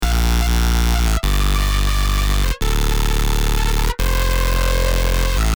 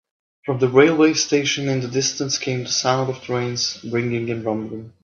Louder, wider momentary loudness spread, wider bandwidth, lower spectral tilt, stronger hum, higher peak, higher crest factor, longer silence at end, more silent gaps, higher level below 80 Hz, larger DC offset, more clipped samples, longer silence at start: about the same, -19 LUFS vs -20 LUFS; second, 3 LU vs 10 LU; first, over 20 kHz vs 7.4 kHz; about the same, -4 dB/octave vs -4 dB/octave; neither; about the same, -4 dBFS vs -2 dBFS; second, 12 dB vs 20 dB; about the same, 0.05 s vs 0.15 s; neither; first, -16 dBFS vs -62 dBFS; neither; neither; second, 0 s vs 0.45 s